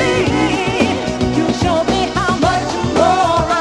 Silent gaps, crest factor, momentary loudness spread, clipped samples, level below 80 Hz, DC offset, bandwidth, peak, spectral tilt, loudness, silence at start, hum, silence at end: none; 14 dB; 4 LU; under 0.1%; -32 dBFS; under 0.1%; 12 kHz; 0 dBFS; -5 dB/octave; -15 LUFS; 0 s; none; 0 s